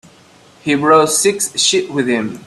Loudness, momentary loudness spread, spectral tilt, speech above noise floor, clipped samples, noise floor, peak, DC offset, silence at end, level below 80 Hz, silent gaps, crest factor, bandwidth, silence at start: -13 LUFS; 8 LU; -2.5 dB/octave; 31 dB; under 0.1%; -46 dBFS; 0 dBFS; under 0.1%; 0.05 s; -58 dBFS; none; 16 dB; 14 kHz; 0.65 s